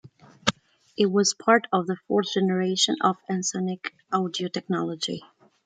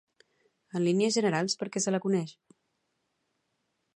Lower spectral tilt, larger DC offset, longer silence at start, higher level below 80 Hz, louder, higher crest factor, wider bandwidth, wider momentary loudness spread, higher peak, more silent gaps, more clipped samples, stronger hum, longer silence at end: about the same, -4 dB/octave vs -4.5 dB/octave; neither; second, 0.05 s vs 0.75 s; first, -68 dBFS vs -82 dBFS; first, -25 LUFS vs -29 LUFS; first, 24 dB vs 18 dB; second, 9.4 kHz vs 11 kHz; about the same, 9 LU vs 7 LU; first, -2 dBFS vs -14 dBFS; neither; neither; neither; second, 0.45 s vs 1.65 s